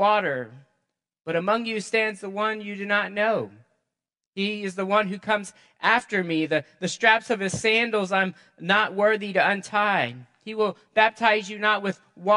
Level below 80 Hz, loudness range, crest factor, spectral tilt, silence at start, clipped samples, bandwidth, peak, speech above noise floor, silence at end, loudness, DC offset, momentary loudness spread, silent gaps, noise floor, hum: -72 dBFS; 4 LU; 22 dB; -4 dB/octave; 0 s; under 0.1%; 11.5 kHz; -2 dBFS; 62 dB; 0 s; -24 LUFS; under 0.1%; 11 LU; 4.27-4.33 s; -86 dBFS; none